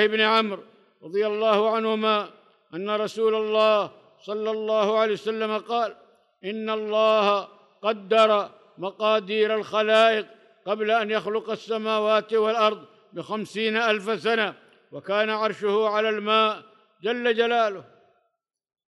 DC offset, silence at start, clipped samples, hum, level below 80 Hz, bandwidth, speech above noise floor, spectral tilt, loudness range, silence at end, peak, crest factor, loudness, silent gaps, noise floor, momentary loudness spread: under 0.1%; 0 s; under 0.1%; none; -82 dBFS; 11 kHz; 54 dB; -4.5 dB/octave; 2 LU; 1.05 s; -8 dBFS; 16 dB; -23 LUFS; none; -77 dBFS; 15 LU